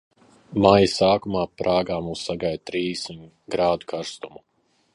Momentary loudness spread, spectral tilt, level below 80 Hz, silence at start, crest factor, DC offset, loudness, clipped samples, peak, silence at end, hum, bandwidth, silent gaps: 17 LU; -5.5 dB/octave; -50 dBFS; 0.5 s; 22 dB; under 0.1%; -22 LUFS; under 0.1%; -2 dBFS; 0.65 s; none; 11.5 kHz; none